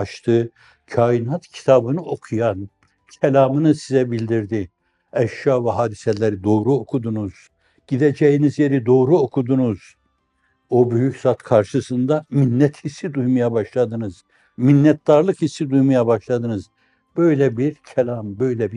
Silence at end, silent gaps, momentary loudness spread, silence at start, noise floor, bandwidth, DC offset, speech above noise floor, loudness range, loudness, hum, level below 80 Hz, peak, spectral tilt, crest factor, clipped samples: 0 s; none; 11 LU; 0 s; -66 dBFS; 10.5 kHz; under 0.1%; 48 dB; 3 LU; -19 LUFS; none; -62 dBFS; -2 dBFS; -8 dB/octave; 16 dB; under 0.1%